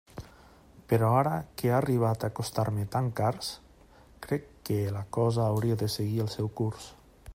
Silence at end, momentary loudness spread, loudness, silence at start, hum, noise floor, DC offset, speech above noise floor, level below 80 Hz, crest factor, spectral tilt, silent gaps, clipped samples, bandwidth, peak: 0 s; 12 LU; -29 LUFS; 0.15 s; none; -56 dBFS; under 0.1%; 28 dB; -56 dBFS; 18 dB; -6.5 dB/octave; none; under 0.1%; 16 kHz; -12 dBFS